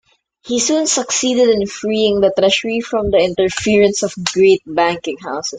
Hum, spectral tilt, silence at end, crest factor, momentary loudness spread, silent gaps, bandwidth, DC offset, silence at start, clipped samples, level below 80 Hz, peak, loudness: none; -3 dB/octave; 0 s; 16 dB; 6 LU; none; 9.6 kHz; under 0.1%; 0.45 s; under 0.1%; -44 dBFS; 0 dBFS; -15 LUFS